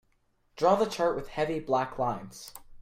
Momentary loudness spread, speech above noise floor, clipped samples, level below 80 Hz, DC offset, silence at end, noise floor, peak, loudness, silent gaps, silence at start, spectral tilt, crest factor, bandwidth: 18 LU; 42 dB; under 0.1%; -54 dBFS; under 0.1%; 0 s; -70 dBFS; -10 dBFS; -29 LUFS; none; 0.55 s; -5.5 dB/octave; 20 dB; 16 kHz